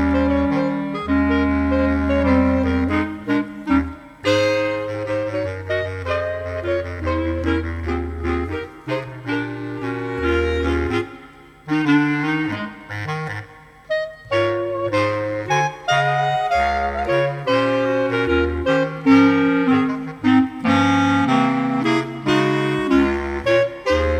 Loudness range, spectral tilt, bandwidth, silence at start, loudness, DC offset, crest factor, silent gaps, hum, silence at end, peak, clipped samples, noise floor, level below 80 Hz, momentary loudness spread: 7 LU; -6.5 dB/octave; 9.2 kHz; 0 s; -20 LUFS; under 0.1%; 18 dB; none; 50 Hz at -55 dBFS; 0 s; -2 dBFS; under 0.1%; -43 dBFS; -34 dBFS; 9 LU